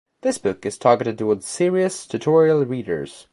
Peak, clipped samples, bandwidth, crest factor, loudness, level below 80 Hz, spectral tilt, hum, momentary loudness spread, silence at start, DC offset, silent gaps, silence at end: -2 dBFS; under 0.1%; 11.5 kHz; 18 dB; -20 LUFS; -58 dBFS; -5.5 dB/octave; none; 9 LU; 0.25 s; under 0.1%; none; 0.1 s